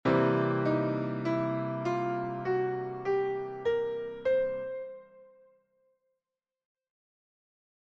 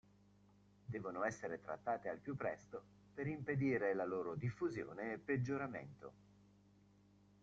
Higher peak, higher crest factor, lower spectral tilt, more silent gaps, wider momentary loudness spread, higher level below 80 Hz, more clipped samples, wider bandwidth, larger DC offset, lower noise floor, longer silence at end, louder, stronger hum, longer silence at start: first, -14 dBFS vs -26 dBFS; about the same, 18 dB vs 18 dB; about the same, -8.5 dB/octave vs -7.5 dB/octave; neither; second, 8 LU vs 16 LU; first, -66 dBFS vs -74 dBFS; neither; about the same, 7.2 kHz vs 7.8 kHz; neither; first, under -90 dBFS vs -69 dBFS; first, 2.6 s vs 1.3 s; first, -31 LUFS vs -43 LUFS; second, none vs 50 Hz at -65 dBFS; second, 0.05 s vs 0.9 s